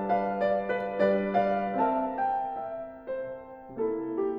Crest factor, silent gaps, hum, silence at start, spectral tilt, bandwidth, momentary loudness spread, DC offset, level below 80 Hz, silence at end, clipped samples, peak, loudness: 16 dB; none; none; 0 s; -9 dB/octave; 5.8 kHz; 12 LU; under 0.1%; -60 dBFS; 0 s; under 0.1%; -14 dBFS; -29 LUFS